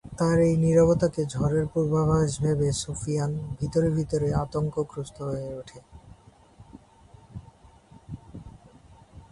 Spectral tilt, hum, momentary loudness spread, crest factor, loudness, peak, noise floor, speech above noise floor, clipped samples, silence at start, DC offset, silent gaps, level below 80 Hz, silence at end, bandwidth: -7 dB/octave; none; 24 LU; 18 dB; -25 LUFS; -10 dBFS; -53 dBFS; 29 dB; under 0.1%; 0.05 s; under 0.1%; none; -46 dBFS; 0.1 s; 11.5 kHz